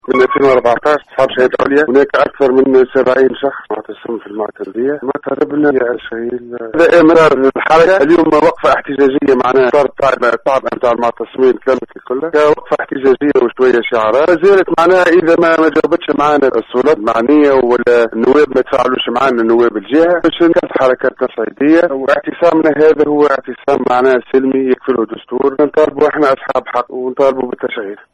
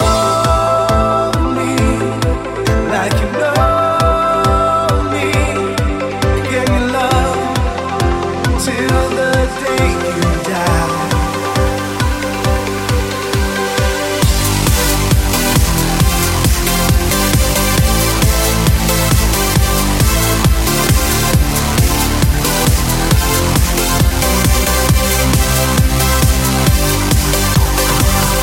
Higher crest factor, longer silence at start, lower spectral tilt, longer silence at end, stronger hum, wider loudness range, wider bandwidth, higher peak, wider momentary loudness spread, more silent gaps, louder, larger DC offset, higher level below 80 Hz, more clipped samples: about the same, 10 dB vs 12 dB; about the same, 0.1 s vs 0 s; first, -6 dB/octave vs -4.5 dB/octave; first, 0.2 s vs 0 s; neither; about the same, 4 LU vs 3 LU; second, 9.4 kHz vs 17 kHz; about the same, 0 dBFS vs 0 dBFS; first, 10 LU vs 4 LU; neither; about the same, -11 LUFS vs -13 LUFS; neither; second, -48 dBFS vs -18 dBFS; neither